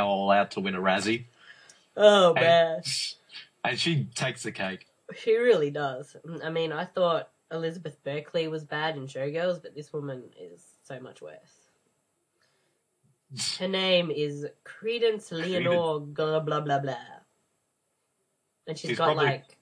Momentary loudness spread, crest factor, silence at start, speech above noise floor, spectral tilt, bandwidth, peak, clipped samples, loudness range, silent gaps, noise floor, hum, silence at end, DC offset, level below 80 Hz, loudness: 20 LU; 22 dB; 0 s; 49 dB; -4.5 dB/octave; 11 kHz; -6 dBFS; under 0.1%; 12 LU; none; -76 dBFS; none; 0.2 s; under 0.1%; -78 dBFS; -27 LUFS